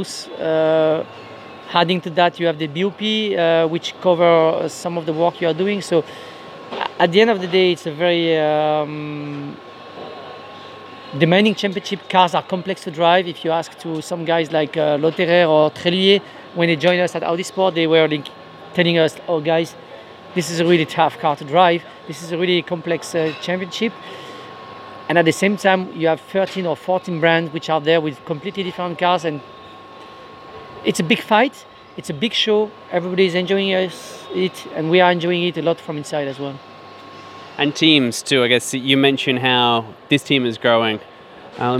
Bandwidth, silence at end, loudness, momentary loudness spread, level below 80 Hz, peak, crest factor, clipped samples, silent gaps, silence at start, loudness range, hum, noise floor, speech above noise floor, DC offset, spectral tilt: 15 kHz; 0 s; -18 LUFS; 20 LU; -66 dBFS; 0 dBFS; 18 dB; under 0.1%; none; 0 s; 5 LU; none; -39 dBFS; 21 dB; under 0.1%; -5 dB/octave